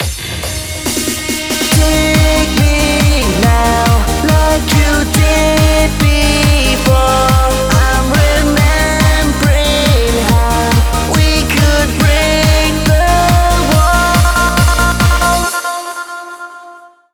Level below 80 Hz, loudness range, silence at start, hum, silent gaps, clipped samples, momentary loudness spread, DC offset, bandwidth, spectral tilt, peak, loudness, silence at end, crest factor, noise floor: -16 dBFS; 1 LU; 0 s; none; none; under 0.1%; 6 LU; under 0.1%; over 20 kHz; -4.5 dB/octave; 0 dBFS; -11 LUFS; 0.35 s; 10 dB; -36 dBFS